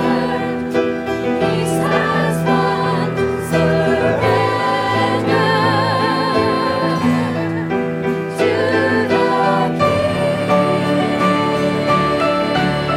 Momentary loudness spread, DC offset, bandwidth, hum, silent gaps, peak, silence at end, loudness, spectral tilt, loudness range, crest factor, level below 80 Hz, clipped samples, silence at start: 5 LU; under 0.1%; 16 kHz; none; none; -4 dBFS; 0 s; -16 LUFS; -6 dB/octave; 1 LU; 12 dB; -44 dBFS; under 0.1%; 0 s